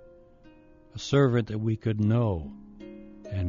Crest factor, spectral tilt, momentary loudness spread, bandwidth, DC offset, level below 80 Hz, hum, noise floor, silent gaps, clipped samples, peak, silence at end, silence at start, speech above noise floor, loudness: 16 dB; -7.5 dB/octave; 22 LU; 7.2 kHz; under 0.1%; -50 dBFS; none; -54 dBFS; none; under 0.1%; -12 dBFS; 0 s; 0.95 s; 28 dB; -27 LUFS